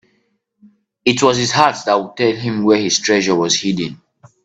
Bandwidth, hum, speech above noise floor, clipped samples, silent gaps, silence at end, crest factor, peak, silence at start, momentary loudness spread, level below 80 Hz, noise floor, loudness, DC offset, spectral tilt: 9.2 kHz; none; 49 dB; under 0.1%; none; 0.5 s; 16 dB; 0 dBFS; 1.05 s; 6 LU; -56 dBFS; -64 dBFS; -15 LUFS; under 0.1%; -3.5 dB/octave